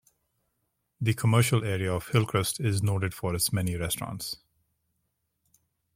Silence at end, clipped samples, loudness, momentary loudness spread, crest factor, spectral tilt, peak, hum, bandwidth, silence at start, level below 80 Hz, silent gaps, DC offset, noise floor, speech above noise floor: 1.6 s; under 0.1%; -28 LUFS; 9 LU; 20 dB; -5 dB/octave; -10 dBFS; none; 16.5 kHz; 1 s; -56 dBFS; none; under 0.1%; -78 dBFS; 51 dB